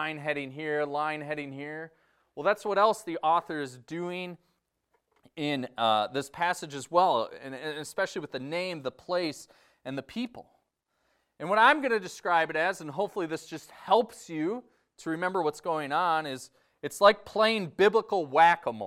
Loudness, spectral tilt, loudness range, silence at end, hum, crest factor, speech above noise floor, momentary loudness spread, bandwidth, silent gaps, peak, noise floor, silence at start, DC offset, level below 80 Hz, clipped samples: -28 LUFS; -4 dB/octave; 6 LU; 0 s; none; 24 dB; 48 dB; 16 LU; 15.5 kHz; none; -6 dBFS; -77 dBFS; 0 s; under 0.1%; -74 dBFS; under 0.1%